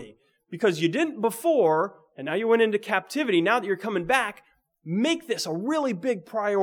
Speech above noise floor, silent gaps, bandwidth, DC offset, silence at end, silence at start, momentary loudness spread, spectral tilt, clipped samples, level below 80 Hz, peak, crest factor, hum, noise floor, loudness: 25 dB; none; 20 kHz; under 0.1%; 0 s; 0 s; 8 LU; -5 dB/octave; under 0.1%; -68 dBFS; -6 dBFS; 18 dB; none; -49 dBFS; -25 LUFS